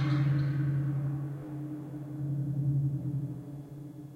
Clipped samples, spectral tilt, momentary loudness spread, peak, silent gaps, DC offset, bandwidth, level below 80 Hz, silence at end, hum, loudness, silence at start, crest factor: under 0.1%; -9.5 dB/octave; 14 LU; -20 dBFS; none; under 0.1%; 4.7 kHz; -62 dBFS; 0 s; none; -33 LUFS; 0 s; 12 dB